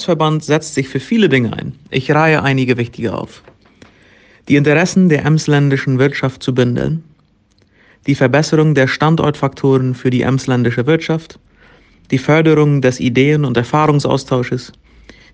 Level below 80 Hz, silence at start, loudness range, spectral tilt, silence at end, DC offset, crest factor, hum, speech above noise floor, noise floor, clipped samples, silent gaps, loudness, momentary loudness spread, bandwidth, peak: -46 dBFS; 0 s; 2 LU; -6.5 dB/octave; 0.65 s; under 0.1%; 14 dB; none; 41 dB; -54 dBFS; under 0.1%; none; -14 LUFS; 9 LU; 9.2 kHz; 0 dBFS